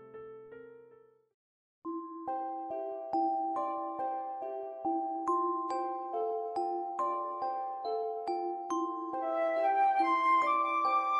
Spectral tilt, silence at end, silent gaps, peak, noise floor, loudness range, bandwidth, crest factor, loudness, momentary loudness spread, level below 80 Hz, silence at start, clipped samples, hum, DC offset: -4 dB/octave; 0 s; 1.34-1.82 s; -18 dBFS; -61 dBFS; 7 LU; 11 kHz; 14 dB; -33 LUFS; 13 LU; -84 dBFS; 0 s; under 0.1%; none; under 0.1%